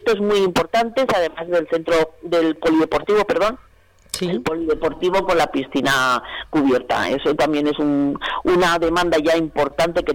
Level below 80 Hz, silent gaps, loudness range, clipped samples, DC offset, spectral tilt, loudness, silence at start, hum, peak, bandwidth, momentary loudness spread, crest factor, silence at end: -44 dBFS; none; 2 LU; under 0.1%; under 0.1%; -4.5 dB/octave; -19 LUFS; 0 s; none; -10 dBFS; 18.5 kHz; 5 LU; 8 dB; 0 s